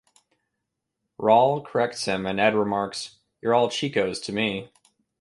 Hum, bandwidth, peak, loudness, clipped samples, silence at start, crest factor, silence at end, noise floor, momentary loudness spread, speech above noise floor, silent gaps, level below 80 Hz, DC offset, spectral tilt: none; 11.5 kHz; -6 dBFS; -23 LUFS; under 0.1%; 1.2 s; 20 dB; 0.55 s; -81 dBFS; 12 LU; 58 dB; none; -62 dBFS; under 0.1%; -4.5 dB/octave